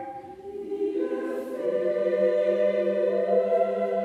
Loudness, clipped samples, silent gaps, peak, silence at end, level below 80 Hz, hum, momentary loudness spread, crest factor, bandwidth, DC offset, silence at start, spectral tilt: -25 LUFS; under 0.1%; none; -12 dBFS; 0 s; -72 dBFS; none; 13 LU; 14 dB; 6.4 kHz; under 0.1%; 0 s; -7.5 dB/octave